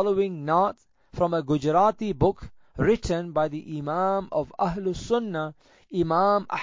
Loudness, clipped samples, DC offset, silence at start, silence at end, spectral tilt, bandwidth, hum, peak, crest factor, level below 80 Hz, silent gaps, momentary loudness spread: -25 LUFS; under 0.1%; under 0.1%; 0 s; 0 s; -7 dB/octave; 7.6 kHz; none; -8 dBFS; 16 dB; -48 dBFS; none; 11 LU